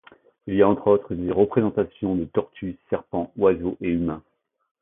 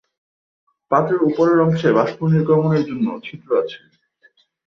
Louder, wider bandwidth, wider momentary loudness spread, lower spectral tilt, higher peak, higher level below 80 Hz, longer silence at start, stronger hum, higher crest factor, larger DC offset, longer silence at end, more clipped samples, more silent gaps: second, -23 LUFS vs -18 LUFS; second, 3.8 kHz vs 6.4 kHz; about the same, 10 LU vs 9 LU; first, -12.5 dB/octave vs -9 dB/octave; about the same, -4 dBFS vs -2 dBFS; first, -50 dBFS vs -62 dBFS; second, 0.45 s vs 0.9 s; neither; about the same, 20 dB vs 16 dB; neither; second, 0.65 s vs 0.9 s; neither; neither